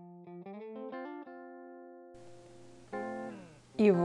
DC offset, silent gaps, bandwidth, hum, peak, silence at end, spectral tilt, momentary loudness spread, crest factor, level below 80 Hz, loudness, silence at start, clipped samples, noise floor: under 0.1%; none; 10.5 kHz; none; -14 dBFS; 0 s; -8 dB/octave; 17 LU; 22 dB; -76 dBFS; -38 LUFS; 0 s; under 0.1%; -55 dBFS